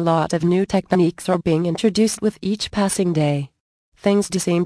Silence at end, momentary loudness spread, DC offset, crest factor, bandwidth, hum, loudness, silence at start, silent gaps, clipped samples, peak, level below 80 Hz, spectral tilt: 0 s; 5 LU; under 0.1%; 16 dB; 11 kHz; none; -20 LUFS; 0 s; 3.60-3.92 s; under 0.1%; -4 dBFS; -50 dBFS; -5.5 dB/octave